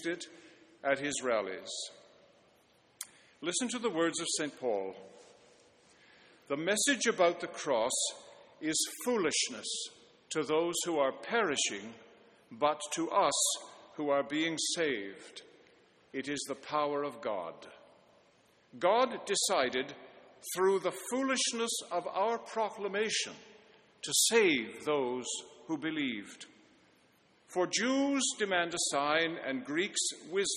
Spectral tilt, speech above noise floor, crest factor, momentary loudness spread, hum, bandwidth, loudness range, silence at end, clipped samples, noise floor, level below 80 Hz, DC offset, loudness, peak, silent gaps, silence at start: -2 dB/octave; 34 dB; 22 dB; 15 LU; none; 13 kHz; 5 LU; 0 s; under 0.1%; -67 dBFS; -78 dBFS; under 0.1%; -32 LUFS; -12 dBFS; none; 0 s